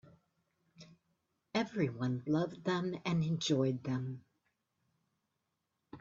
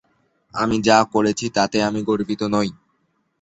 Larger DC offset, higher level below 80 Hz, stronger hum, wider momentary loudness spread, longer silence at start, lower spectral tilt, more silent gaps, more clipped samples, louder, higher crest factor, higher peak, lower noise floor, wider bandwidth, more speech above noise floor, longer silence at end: neither; second, -74 dBFS vs -52 dBFS; neither; about the same, 6 LU vs 8 LU; first, 0.8 s vs 0.55 s; first, -6 dB/octave vs -4.5 dB/octave; neither; neither; second, -36 LUFS vs -20 LUFS; about the same, 20 dB vs 20 dB; second, -20 dBFS vs -2 dBFS; first, -85 dBFS vs -68 dBFS; about the same, 7.6 kHz vs 8.2 kHz; about the same, 50 dB vs 49 dB; second, 0 s vs 0.7 s